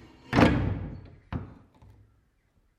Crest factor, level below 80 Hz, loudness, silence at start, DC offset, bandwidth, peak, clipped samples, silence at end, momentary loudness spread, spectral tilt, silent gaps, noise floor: 24 dB; -42 dBFS; -27 LUFS; 0.3 s; under 0.1%; 14 kHz; -6 dBFS; under 0.1%; 1.3 s; 22 LU; -7 dB/octave; none; -68 dBFS